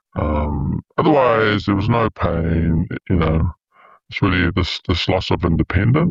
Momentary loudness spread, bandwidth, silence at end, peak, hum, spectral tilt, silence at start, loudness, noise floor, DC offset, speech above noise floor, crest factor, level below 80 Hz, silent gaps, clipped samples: 7 LU; 7.4 kHz; 0 s; -2 dBFS; none; -7.5 dB/octave; 0.15 s; -18 LUFS; -51 dBFS; under 0.1%; 34 dB; 14 dB; -30 dBFS; none; under 0.1%